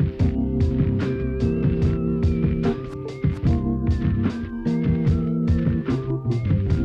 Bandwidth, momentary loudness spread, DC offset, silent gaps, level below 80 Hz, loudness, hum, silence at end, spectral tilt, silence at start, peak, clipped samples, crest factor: 7.2 kHz; 4 LU; under 0.1%; none; -30 dBFS; -23 LUFS; none; 0 s; -9.5 dB/octave; 0 s; -8 dBFS; under 0.1%; 14 dB